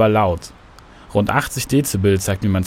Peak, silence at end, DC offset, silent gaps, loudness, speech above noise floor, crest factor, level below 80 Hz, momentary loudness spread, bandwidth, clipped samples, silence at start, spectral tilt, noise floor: -2 dBFS; 0 s; under 0.1%; none; -19 LUFS; 26 dB; 16 dB; -42 dBFS; 7 LU; 16.5 kHz; under 0.1%; 0 s; -5.5 dB/octave; -43 dBFS